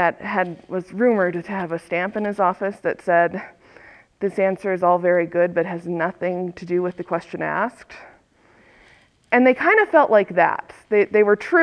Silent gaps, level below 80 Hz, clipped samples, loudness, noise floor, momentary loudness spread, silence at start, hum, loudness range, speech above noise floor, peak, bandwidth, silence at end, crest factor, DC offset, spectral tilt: none; -64 dBFS; under 0.1%; -20 LUFS; -55 dBFS; 12 LU; 0 s; none; 7 LU; 35 dB; -2 dBFS; 11 kHz; 0 s; 18 dB; under 0.1%; -7.5 dB/octave